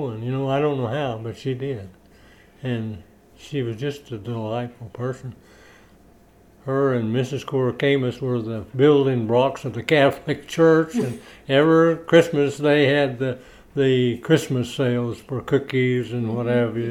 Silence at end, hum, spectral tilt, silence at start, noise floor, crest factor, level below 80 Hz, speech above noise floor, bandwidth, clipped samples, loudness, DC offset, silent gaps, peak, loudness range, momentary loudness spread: 0 s; none; -6.5 dB/octave; 0 s; -52 dBFS; 20 dB; -56 dBFS; 31 dB; 14 kHz; under 0.1%; -21 LUFS; under 0.1%; none; -2 dBFS; 12 LU; 14 LU